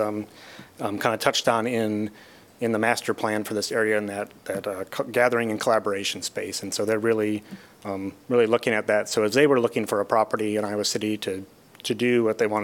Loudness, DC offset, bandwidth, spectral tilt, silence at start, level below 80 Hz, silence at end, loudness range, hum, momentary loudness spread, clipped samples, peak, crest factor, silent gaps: -24 LUFS; under 0.1%; 18 kHz; -4 dB/octave; 0 s; -70 dBFS; 0 s; 3 LU; none; 12 LU; under 0.1%; -4 dBFS; 20 dB; none